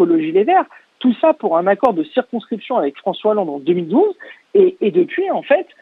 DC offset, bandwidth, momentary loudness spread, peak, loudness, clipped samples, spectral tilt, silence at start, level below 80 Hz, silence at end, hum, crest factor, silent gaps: under 0.1%; 4.2 kHz; 7 LU; 0 dBFS; -17 LUFS; under 0.1%; -8.5 dB/octave; 0 s; -68 dBFS; 0.2 s; none; 16 dB; none